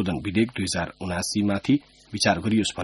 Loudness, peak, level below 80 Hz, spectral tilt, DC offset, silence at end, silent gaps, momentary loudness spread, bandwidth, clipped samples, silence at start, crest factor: -25 LUFS; -6 dBFS; -50 dBFS; -4.5 dB/octave; under 0.1%; 0 s; none; 6 LU; 11.5 kHz; under 0.1%; 0 s; 20 dB